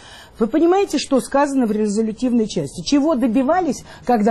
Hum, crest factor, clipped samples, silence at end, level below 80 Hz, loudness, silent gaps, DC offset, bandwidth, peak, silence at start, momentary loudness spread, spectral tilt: none; 12 dB; under 0.1%; 0 s; -48 dBFS; -18 LUFS; none; under 0.1%; 12.5 kHz; -6 dBFS; 0.05 s; 7 LU; -5.5 dB/octave